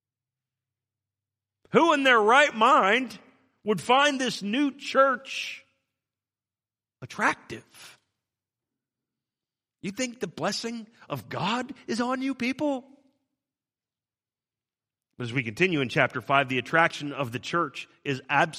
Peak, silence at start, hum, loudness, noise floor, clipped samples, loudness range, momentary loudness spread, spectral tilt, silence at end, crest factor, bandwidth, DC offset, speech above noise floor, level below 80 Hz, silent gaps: -4 dBFS; 1.75 s; none; -25 LUFS; under -90 dBFS; under 0.1%; 13 LU; 17 LU; -4 dB/octave; 0 s; 24 dB; 15 kHz; under 0.1%; over 65 dB; -72 dBFS; none